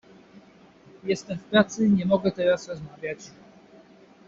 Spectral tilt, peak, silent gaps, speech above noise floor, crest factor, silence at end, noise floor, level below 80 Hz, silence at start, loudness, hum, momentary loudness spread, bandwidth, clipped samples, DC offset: -5 dB/octave; -6 dBFS; none; 29 dB; 20 dB; 1 s; -53 dBFS; -62 dBFS; 0.35 s; -25 LUFS; none; 16 LU; 7.6 kHz; under 0.1%; under 0.1%